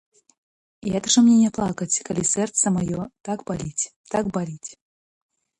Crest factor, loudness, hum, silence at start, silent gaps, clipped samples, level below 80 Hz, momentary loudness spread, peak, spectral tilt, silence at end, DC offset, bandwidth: 16 dB; -22 LUFS; none; 0.85 s; 3.96-4.04 s; under 0.1%; -54 dBFS; 15 LU; -6 dBFS; -4 dB/octave; 0.85 s; under 0.1%; 11 kHz